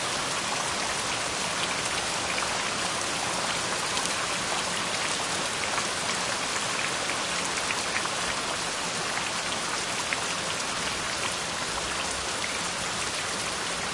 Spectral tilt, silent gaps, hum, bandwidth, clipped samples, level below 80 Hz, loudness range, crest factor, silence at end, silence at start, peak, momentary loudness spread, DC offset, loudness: -1 dB/octave; none; none; 12 kHz; under 0.1%; -56 dBFS; 1 LU; 24 dB; 0 s; 0 s; -4 dBFS; 2 LU; under 0.1%; -27 LUFS